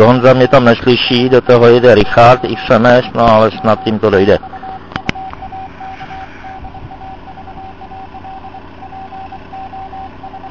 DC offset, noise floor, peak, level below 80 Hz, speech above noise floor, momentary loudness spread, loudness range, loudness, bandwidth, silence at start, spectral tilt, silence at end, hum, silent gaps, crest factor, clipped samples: 1%; -31 dBFS; 0 dBFS; -36 dBFS; 23 dB; 24 LU; 22 LU; -9 LUFS; 8 kHz; 0 s; -7 dB/octave; 0 s; none; none; 12 dB; 0.9%